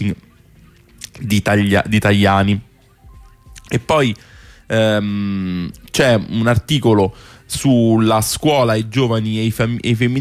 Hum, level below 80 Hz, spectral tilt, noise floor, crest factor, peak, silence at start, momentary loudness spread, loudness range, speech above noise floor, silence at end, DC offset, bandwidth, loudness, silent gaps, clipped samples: none; -42 dBFS; -5.5 dB/octave; -47 dBFS; 14 dB; -4 dBFS; 0 s; 10 LU; 4 LU; 32 dB; 0 s; under 0.1%; 15.5 kHz; -16 LUFS; none; under 0.1%